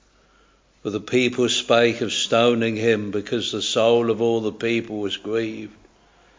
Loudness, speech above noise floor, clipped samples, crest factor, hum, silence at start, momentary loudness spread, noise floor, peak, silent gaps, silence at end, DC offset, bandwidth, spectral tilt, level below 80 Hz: -21 LUFS; 37 dB; under 0.1%; 18 dB; none; 0.85 s; 11 LU; -58 dBFS; -4 dBFS; none; 0.7 s; under 0.1%; 7.6 kHz; -4 dB/octave; -60 dBFS